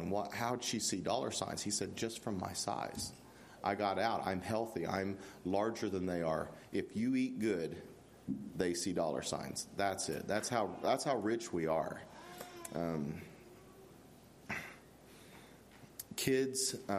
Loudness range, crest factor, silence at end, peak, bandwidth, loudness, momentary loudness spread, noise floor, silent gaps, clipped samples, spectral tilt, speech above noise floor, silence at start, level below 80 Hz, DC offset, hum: 8 LU; 22 dB; 0 s; -16 dBFS; 15 kHz; -38 LUFS; 21 LU; -59 dBFS; none; under 0.1%; -4 dB/octave; 22 dB; 0 s; -70 dBFS; under 0.1%; none